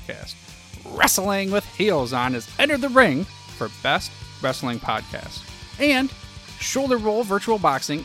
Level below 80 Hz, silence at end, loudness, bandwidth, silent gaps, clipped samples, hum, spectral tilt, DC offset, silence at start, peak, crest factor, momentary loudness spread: -48 dBFS; 0 s; -21 LUFS; 16.5 kHz; none; under 0.1%; none; -3.5 dB/octave; under 0.1%; 0 s; -2 dBFS; 22 dB; 18 LU